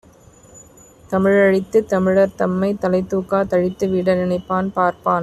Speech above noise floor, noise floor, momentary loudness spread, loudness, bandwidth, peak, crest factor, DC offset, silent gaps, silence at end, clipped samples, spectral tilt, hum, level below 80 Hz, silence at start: 30 dB; -47 dBFS; 5 LU; -18 LUFS; 12.5 kHz; -4 dBFS; 14 dB; under 0.1%; none; 0 s; under 0.1%; -7.5 dB/octave; none; -50 dBFS; 0.55 s